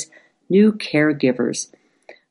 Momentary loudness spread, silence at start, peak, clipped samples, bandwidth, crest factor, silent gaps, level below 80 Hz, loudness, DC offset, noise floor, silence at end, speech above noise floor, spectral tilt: 15 LU; 0 s; -4 dBFS; under 0.1%; 11 kHz; 16 dB; none; -66 dBFS; -18 LUFS; under 0.1%; -48 dBFS; 0.65 s; 31 dB; -5.5 dB/octave